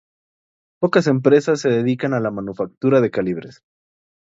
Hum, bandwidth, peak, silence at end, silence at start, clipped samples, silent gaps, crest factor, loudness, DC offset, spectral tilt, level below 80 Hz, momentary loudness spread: none; 7.8 kHz; 0 dBFS; 0.8 s; 0.8 s; under 0.1%; 2.77-2.81 s; 18 dB; -18 LUFS; under 0.1%; -7 dB/octave; -60 dBFS; 10 LU